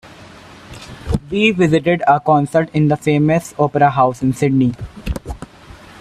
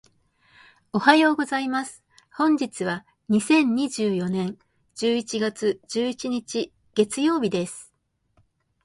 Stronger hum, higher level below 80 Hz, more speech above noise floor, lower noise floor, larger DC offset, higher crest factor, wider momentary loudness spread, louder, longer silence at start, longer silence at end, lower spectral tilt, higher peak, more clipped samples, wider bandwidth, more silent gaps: neither; first, -36 dBFS vs -66 dBFS; second, 25 dB vs 46 dB; second, -40 dBFS vs -69 dBFS; neither; second, 16 dB vs 24 dB; first, 19 LU vs 12 LU; first, -15 LUFS vs -24 LUFS; second, 0.05 s vs 0.95 s; second, 0.55 s vs 1 s; first, -7 dB/octave vs -4.5 dB/octave; about the same, 0 dBFS vs -2 dBFS; neither; first, 13.5 kHz vs 11.5 kHz; neither